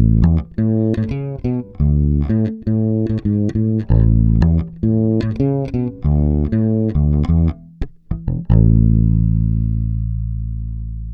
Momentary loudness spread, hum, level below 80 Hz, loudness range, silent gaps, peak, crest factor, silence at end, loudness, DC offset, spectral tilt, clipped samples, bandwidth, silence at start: 10 LU; none; -22 dBFS; 2 LU; none; 0 dBFS; 16 dB; 0 s; -17 LUFS; under 0.1%; -11.5 dB/octave; under 0.1%; 4.7 kHz; 0 s